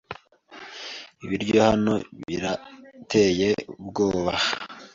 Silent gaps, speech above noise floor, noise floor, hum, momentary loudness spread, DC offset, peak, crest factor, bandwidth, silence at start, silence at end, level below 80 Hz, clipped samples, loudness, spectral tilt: none; 24 dB; -47 dBFS; none; 18 LU; under 0.1%; -6 dBFS; 20 dB; 7.6 kHz; 0.1 s; 0.1 s; -52 dBFS; under 0.1%; -24 LUFS; -5 dB/octave